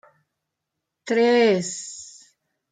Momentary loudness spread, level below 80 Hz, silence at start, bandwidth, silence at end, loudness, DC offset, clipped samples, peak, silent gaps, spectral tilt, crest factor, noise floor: 24 LU; -74 dBFS; 1.05 s; 9.4 kHz; 0.65 s; -20 LUFS; under 0.1%; under 0.1%; -8 dBFS; none; -4 dB/octave; 16 dB; -82 dBFS